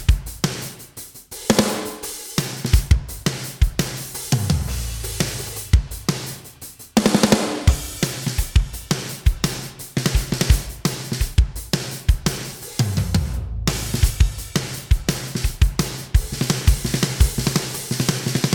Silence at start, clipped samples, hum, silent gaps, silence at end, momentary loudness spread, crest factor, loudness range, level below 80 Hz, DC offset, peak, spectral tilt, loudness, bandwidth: 0 s; under 0.1%; none; none; 0 s; 9 LU; 18 dB; 2 LU; -24 dBFS; under 0.1%; -2 dBFS; -4.5 dB/octave; -22 LUFS; 19 kHz